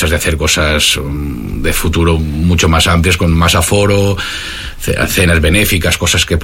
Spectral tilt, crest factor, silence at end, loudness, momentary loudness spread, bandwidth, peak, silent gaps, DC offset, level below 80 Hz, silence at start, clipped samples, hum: -4 dB/octave; 12 dB; 0 s; -11 LUFS; 10 LU; 16.5 kHz; 0 dBFS; none; under 0.1%; -20 dBFS; 0 s; under 0.1%; none